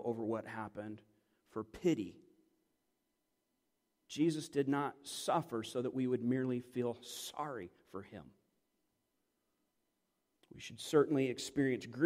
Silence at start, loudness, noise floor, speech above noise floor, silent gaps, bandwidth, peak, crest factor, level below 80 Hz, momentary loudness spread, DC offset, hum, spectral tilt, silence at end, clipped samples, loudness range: 0 s; -37 LUFS; -84 dBFS; 47 dB; none; 15.5 kHz; -18 dBFS; 22 dB; -76 dBFS; 16 LU; under 0.1%; none; -5.5 dB/octave; 0 s; under 0.1%; 12 LU